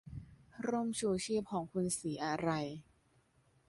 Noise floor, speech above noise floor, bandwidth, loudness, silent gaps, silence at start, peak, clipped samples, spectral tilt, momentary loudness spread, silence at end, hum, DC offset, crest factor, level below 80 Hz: -72 dBFS; 35 dB; 11.5 kHz; -37 LUFS; none; 0.05 s; -22 dBFS; under 0.1%; -5 dB/octave; 16 LU; 0.85 s; none; under 0.1%; 18 dB; -66 dBFS